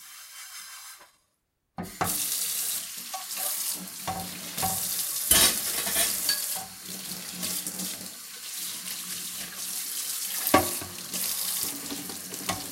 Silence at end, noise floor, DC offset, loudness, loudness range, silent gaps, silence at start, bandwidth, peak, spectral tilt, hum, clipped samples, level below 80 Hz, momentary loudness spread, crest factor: 0 s; -76 dBFS; under 0.1%; -27 LUFS; 7 LU; none; 0 s; 17 kHz; -4 dBFS; -1 dB/octave; none; under 0.1%; -58 dBFS; 15 LU; 26 dB